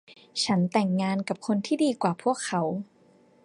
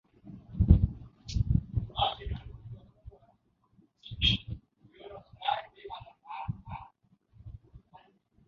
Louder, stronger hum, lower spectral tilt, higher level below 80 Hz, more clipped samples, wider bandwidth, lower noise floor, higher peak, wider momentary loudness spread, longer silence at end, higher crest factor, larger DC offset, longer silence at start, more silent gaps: first, -27 LUFS vs -31 LUFS; neither; about the same, -5.5 dB/octave vs -6.5 dB/octave; second, -70 dBFS vs -38 dBFS; neither; first, 11 kHz vs 7.2 kHz; second, -59 dBFS vs -69 dBFS; second, -10 dBFS vs -6 dBFS; second, 8 LU vs 25 LU; about the same, 0.6 s vs 0.7 s; second, 18 dB vs 26 dB; neither; second, 0.1 s vs 0.25 s; neither